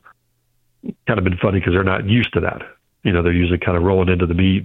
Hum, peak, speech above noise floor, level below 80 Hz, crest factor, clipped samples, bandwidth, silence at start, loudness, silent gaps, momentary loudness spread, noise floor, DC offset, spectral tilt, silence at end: none; 0 dBFS; 48 dB; -36 dBFS; 18 dB; under 0.1%; 4.1 kHz; 0.85 s; -18 LUFS; none; 12 LU; -65 dBFS; under 0.1%; -9.5 dB/octave; 0 s